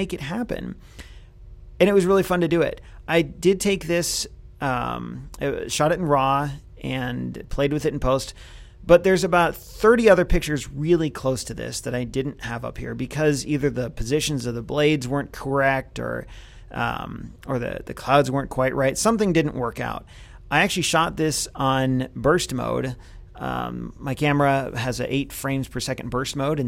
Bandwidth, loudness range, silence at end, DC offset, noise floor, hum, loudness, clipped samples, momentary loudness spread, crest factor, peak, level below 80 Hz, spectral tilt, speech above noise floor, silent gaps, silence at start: 16.5 kHz; 5 LU; 0 s; under 0.1%; -43 dBFS; none; -23 LUFS; under 0.1%; 13 LU; 20 dB; -2 dBFS; -40 dBFS; -5 dB/octave; 21 dB; none; 0 s